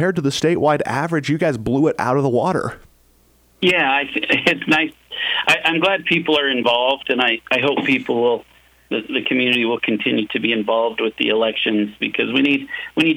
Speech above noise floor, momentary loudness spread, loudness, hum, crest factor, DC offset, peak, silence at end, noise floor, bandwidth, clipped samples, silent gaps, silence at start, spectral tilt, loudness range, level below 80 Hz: 37 dB; 5 LU; -18 LUFS; none; 16 dB; under 0.1%; -2 dBFS; 0 s; -55 dBFS; 16.5 kHz; under 0.1%; none; 0 s; -5 dB/octave; 3 LU; -54 dBFS